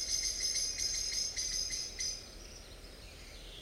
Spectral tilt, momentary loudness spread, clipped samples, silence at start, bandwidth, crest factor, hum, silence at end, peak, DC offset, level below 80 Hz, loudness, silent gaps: 0.5 dB/octave; 19 LU; under 0.1%; 0 s; 16 kHz; 18 dB; none; 0 s; -22 dBFS; under 0.1%; -52 dBFS; -34 LUFS; none